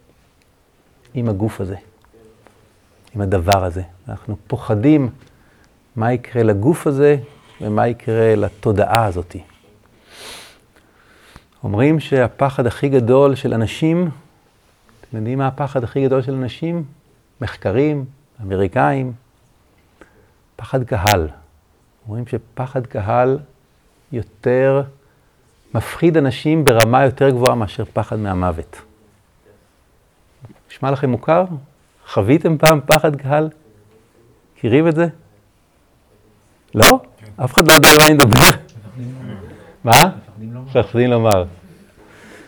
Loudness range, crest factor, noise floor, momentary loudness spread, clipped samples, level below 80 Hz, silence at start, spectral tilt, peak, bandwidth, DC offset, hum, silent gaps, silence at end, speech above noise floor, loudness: 12 LU; 18 dB; -56 dBFS; 20 LU; under 0.1%; -42 dBFS; 1.15 s; -5 dB/octave; 0 dBFS; over 20 kHz; under 0.1%; none; none; 0.95 s; 41 dB; -15 LUFS